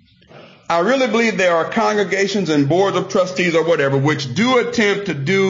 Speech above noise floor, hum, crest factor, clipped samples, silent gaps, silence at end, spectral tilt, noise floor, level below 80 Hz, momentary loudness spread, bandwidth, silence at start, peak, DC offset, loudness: 27 dB; none; 12 dB; under 0.1%; none; 0 s; -5 dB/octave; -44 dBFS; -60 dBFS; 3 LU; 7.6 kHz; 0.35 s; -6 dBFS; under 0.1%; -16 LUFS